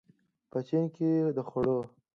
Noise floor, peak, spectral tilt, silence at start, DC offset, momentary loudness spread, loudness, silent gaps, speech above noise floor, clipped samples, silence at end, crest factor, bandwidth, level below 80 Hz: -62 dBFS; -16 dBFS; -10.5 dB/octave; 0.55 s; under 0.1%; 8 LU; -31 LUFS; none; 33 dB; under 0.1%; 0.3 s; 14 dB; 6.6 kHz; -66 dBFS